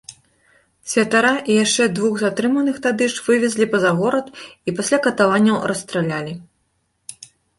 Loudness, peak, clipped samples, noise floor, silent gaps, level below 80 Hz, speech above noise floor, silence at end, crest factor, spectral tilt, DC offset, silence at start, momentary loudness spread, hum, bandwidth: -18 LUFS; -2 dBFS; under 0.1%; -68 dBFS; none; -60 dBFS; 50 dB; 0.45 s; 16 dB; -4 dB/octave; under 0.1%; 0.1 s; 20 LU; none; 11.5 kHz